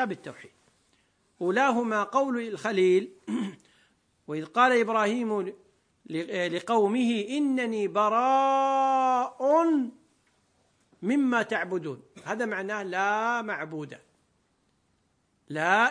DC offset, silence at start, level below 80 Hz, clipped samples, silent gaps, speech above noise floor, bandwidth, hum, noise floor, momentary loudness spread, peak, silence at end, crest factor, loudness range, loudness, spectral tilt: under 0.1%; 0 s; -80 dBFS; under 0.1%; none; 45 dB; 10.5 kHz; none; -71 dBFS; 14 LU; -8 dBFS; 0 s; 20 dB; 6 LU; -26 LUFS; -5 dB/octave